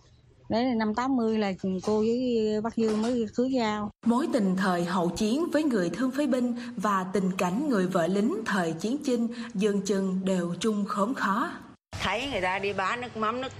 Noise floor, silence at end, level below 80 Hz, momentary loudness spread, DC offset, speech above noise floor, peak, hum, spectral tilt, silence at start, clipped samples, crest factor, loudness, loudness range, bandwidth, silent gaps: -56 dBFS; 0 s; -58 dBFS; 4 LU; under 0.1%; 30 dB; -12 dBFS; none; -6 dB/octave; 0.5 s; under 0.1%; 16 dB; -27 LUFS; 2 LU; 15 kHz; none